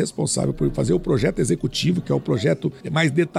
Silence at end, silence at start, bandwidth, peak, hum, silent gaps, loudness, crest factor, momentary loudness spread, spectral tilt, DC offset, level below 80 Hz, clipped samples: 0 s; 0 s; 13.5 kHz; -6 dBFS; none; none; -22 LUFS; 16 dB; 3 LU; -5.5 dB/octave; under 0.1%; -40 dBFS; under 0.1%